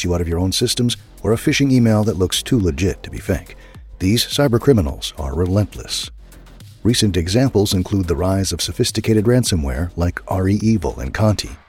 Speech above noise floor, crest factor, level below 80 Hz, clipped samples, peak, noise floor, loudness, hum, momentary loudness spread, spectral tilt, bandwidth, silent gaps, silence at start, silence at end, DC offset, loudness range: 23 dB; 18 dB; -32 dBFS; under 0.1%; 0 dBFS; -40 dBFS; -18 LUFS; none; 9 LU; -5.5 dB/octave; 16.5 kHz; none; 0 s; 0.15 s; under 0.1%; 2 LU